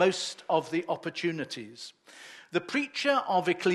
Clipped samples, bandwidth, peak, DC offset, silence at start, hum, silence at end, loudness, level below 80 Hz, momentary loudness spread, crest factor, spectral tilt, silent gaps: under 0.1%; 12.5 kHz; -12 dBFS; under 0.1%; 0 s; none; 0 s; -30 LUFS; -82 dBFS; 19 LU; 18 dB; -4 dB/octave; none